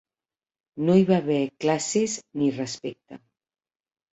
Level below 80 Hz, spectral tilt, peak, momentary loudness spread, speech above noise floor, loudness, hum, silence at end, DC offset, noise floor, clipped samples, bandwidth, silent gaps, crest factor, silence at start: -66 dBFS; -5.5 dB/octave; -8 dBFS; 14 LU; over 66 dB; -24 LUFS; none; 0.95 s; under 0.1%; under -90 dBFS; under 0.1%; 8.2 kHz; none; 18 dB; 0.75 s